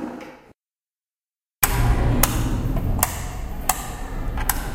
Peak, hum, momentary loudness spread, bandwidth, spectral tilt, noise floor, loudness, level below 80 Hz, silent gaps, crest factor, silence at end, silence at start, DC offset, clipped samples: 0 dBFS; none; 13 LU; 16.5 kHz; -4 dB/octave; under -90 dBFS; -23 LUFS; -26 dBFS; 1.56-1.60 s; 24 dB; 0 s; 0 s; under 0.1%; under 0.1%